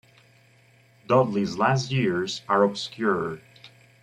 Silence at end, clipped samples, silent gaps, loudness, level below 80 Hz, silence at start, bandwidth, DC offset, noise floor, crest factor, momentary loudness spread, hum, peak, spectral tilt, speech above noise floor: 0.35 s; under 0.1%; none; -24 LUFS; -64 dBFS; 1.1 s; 11 kHz; under 0.1%; -58 dBFS; 18 dB; 7 LU; none; -8 dBFS; -6 dB/octave; 34 dB